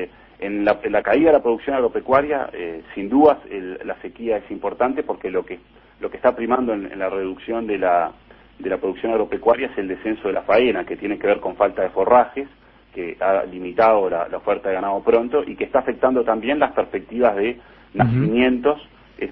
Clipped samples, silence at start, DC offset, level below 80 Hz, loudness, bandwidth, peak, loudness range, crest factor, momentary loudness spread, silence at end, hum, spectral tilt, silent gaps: under 0.1%; 0 s; under 0.1%; -50 dBFS; -20 LUFS; 5.4 kHz; -2 dBFS; 4 LU; 18 dB; 14 LU; 0 s; none; -10 dB/octave; none